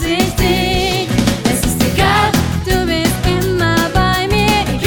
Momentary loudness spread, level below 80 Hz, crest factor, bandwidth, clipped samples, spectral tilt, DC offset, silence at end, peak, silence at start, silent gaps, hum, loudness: 3 LU; -24 dBFS; 14 dB; 19.5 kHz; under 0.1%; -4.5 dB/octave; under 0.1%; 0 s; 0 dBFS; 0 s; none; none; -14 LUFS